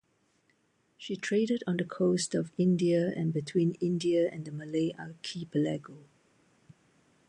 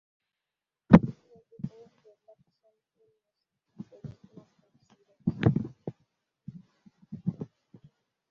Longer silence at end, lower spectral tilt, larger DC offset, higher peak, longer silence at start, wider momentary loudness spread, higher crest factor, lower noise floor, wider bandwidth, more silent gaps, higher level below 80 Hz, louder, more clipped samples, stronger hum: first, 1.3 s vs 0.85 s; second, -6 dB/octave vs -8.5 dB/octave; neither; second, -16 dBFS vs -2 dBFS; about the same, 1 s vs 0.9 s; second, 12 LU vs 29 LU; second, 14 dB vs 30 dB; second, -71 dBFS vs -89 dBFS; first, 11 kHz vs 6.4 kHz; neither; second, -74 dBFS vs -52 dBFS; second, -31 LUFS vs -26 LUFS; neither; neither